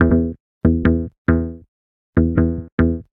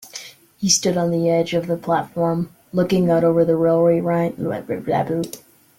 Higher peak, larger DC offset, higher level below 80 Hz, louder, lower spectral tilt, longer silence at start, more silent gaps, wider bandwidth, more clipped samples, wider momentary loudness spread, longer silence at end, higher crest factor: first, 0 dBFS vs -4 dBFS; neither; first, -28 dBFS vs -56 dBFS; about the same, -19 LUFS vs -19 LUFS; first, -12 dB/octave vs -5 dB/octave; about the same, 0 s vs 0 s; first, 0.40-0.61 s, 1.18-1.25 s, 1.68-2.13 s, 2.72-2.78 s vs none; second, 4 kHz vs 16.5 kHz; neither; second, 5 LU vs 10 LU; second, 0.15 s vs 0.4 s; about the same, 18 dB vs 16 dB